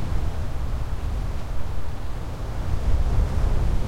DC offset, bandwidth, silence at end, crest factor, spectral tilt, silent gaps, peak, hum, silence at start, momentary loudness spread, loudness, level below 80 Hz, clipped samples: under 0.1%; 12.5 kHz; 0 s; 12 dB; -7 dB/octave; none; -8 dBFS; none; 0 s; 9 LU; -29 LUFS; -26 dBFS; under 0.1%